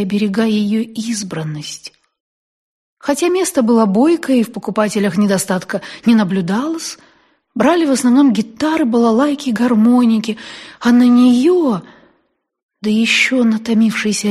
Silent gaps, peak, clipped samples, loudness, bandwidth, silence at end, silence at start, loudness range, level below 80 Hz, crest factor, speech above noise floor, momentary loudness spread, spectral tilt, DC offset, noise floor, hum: 2.20-2.97 s, 12.63-12.69 s; 0 dBFS; under 0.1%; -14 LUFS; 13 kHz; 0 s; 0 s; 4 LU; -60 dBFS; 14 dB; 50 dB; 13 LU; -5 dB/octave; under 0.1%; -64 dBFS; none